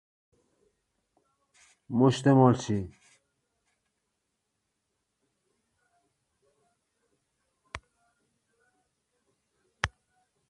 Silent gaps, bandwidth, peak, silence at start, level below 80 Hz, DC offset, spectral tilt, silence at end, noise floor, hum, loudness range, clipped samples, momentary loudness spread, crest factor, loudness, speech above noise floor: none; 11 kHz; -4 dBFS; 1.9 s; -58 dBFS; under 0.1%; -7 dB/octave; 0.6 s; -81 dBFS; none; 15 LU; under 0.1%; 24 LU; 28 dB; -26 LUFS; 58 dB